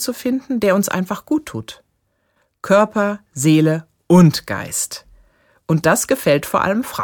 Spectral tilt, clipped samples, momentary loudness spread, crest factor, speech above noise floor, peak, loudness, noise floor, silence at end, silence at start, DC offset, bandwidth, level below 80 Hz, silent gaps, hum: -5.5 dB/octave; under 0.1%; 13 LU; 16 dB; 50 dB; -2 dBFS; -17 LUFS; -67 dBFS; 0 s; 0 s; under 0.1%; 19 kHz; -52 dBFS; none; none